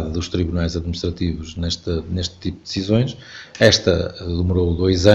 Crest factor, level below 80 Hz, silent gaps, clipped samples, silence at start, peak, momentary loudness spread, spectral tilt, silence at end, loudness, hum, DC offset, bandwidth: 20 dB; -34 dBFS; none; under 0.1%; 0 s; 0 dBFS; 11 LU; -5.5 dB/octave; 0 s; -20 LUFS; none; under 0.1%; 8.2 kHz